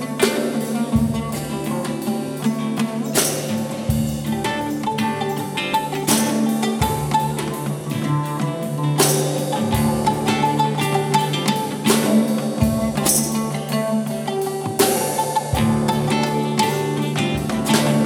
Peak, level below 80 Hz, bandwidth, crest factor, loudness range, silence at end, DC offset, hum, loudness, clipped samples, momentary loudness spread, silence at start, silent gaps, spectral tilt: -2 dBFS; -42 dBFS; 18.5 kHz; 18 dB; 3 LU; 0 s; under 0.1%; none; -20 LUFS; under 0.1%; 7 LU; 0 s; none; -4.5 dB/octave